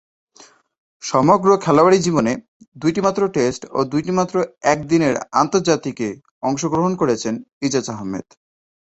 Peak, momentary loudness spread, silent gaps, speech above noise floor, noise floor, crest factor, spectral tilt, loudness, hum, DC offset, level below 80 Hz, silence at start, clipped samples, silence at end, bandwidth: 0 dBFS; 12 LU; 2.48-2.60 s, 2.68-2.72 s, 6.31-6.41 s, 7.53-7.61 s; 31 dB; -49 dBFS; 18 dB; -5.5 dB/octave; -18 LUFS; none; under 0.1%; -54 dBFS; 1 s; under 0.1%; 0.65 s; 8.2 kHz